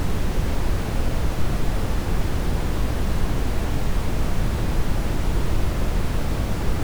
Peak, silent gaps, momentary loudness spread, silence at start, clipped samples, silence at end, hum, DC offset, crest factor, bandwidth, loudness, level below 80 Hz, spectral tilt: -10 dBFS; none; 1 LU; 0 s; under 0.1%; 0 s; none; under 0.1%; 10 dB; over 20 kHz; -26 LUFS; -24 dBFS; -6 dB/octave